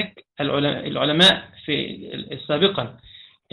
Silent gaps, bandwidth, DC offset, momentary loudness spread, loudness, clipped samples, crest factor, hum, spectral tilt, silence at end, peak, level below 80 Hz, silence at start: none; 9.6 kHz; under 0.1%; 18 LU; -20 LUFS; under 0.1%; 20 dB; none; -4.5 dB/octave; 0.3 s; -2 dBFS; -56 dBFS; 0 s